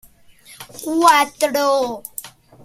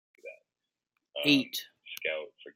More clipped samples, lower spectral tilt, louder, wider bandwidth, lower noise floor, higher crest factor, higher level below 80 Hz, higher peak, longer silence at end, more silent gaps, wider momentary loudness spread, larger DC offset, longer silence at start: neither; second, -2 dB/octave vs -3.5 dB/octave; first, -16 LUFS vs -30 LUFS; about the same, 16.5 kHz vs 16 kHz; second, -47 dBFS vs -89 dBFS; about the same, 20 dB vs 24 dB; first, -60 dBFS vs -80 dBFS; first, 0 dBFS vs -10 dBFS; first, 0.35 s vs 0.05 s; neither; second, 21 LU vs 24 LU; neither; first, 0.5 s vs 0.25 s